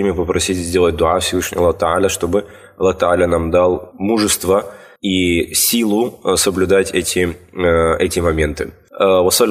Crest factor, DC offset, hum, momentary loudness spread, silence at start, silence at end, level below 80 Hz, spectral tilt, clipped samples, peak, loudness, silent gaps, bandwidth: 14 dB; under 0.1%; none; 6 LU; 0 s; 0 s; -36 dBFS; -4 dB/octave; under 0.1%; 0 dBFS; -16 LUFS; none; 15.5 kHz